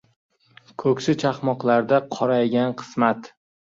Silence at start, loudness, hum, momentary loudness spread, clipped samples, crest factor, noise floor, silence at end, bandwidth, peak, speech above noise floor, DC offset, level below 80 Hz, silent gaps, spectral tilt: 0.8 s; -22 LUFS; none; 6 LU; under 0.1%; 18 dB; -46 dBFS; 0.5 s; 7.8 kHz; -4 dBFS; 25 dB; under 0.1%; -64 dBFS; none; -6.5 dB/octave